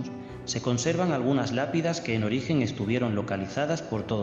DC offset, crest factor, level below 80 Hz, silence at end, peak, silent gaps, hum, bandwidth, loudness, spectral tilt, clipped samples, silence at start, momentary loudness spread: under 0.1%; 16 dB; -58 dBFS; 0 s; -12 dBFS; none; none; 8.4 kHz; -28 LUFS; -5.5 dB/octave; under 0.1%; 0 s; 5 LU